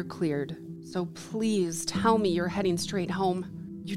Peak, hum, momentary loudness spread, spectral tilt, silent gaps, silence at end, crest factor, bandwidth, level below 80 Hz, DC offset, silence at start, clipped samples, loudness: -12 dBFS; none; 12 LU; -5 dB/octave; none; 0 s; 18 dB; 15 kHz; -58 dBFS; under 0.1%; 0 s; under 0.1%; -29 LUFS